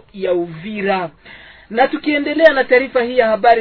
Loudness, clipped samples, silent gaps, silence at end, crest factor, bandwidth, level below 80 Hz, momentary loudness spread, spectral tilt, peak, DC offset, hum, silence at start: -15 LUFS; 0.2%; none; 0 s; 16 dB; 6 kHz; -50 dBFS; 10 LU; -7 dB/octave; 0 dBFS; under 0.1%; none; 0.15 s